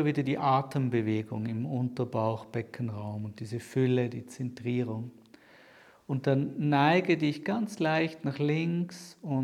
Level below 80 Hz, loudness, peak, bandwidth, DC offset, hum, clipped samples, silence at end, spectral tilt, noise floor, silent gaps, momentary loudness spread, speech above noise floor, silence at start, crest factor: -74 dBFS; -30 LUFS; -10 dBFS; 13.5 kHz; under 0.1%; none; under 0.1%; 0 s; -7.5 dB/octave; -57 dBFS; none; 12 LU; 28 dB; 0 s; 20 dB